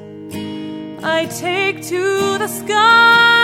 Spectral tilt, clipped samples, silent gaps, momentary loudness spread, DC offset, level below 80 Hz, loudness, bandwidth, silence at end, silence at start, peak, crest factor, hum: -3 dB/octave; under 0.1%; none; 19 LU; under 0.1%; -60 dBFS; -14 LUFS; 16.5 kHz; 0 s; 0 s; -2 dBFS; 14 dB; none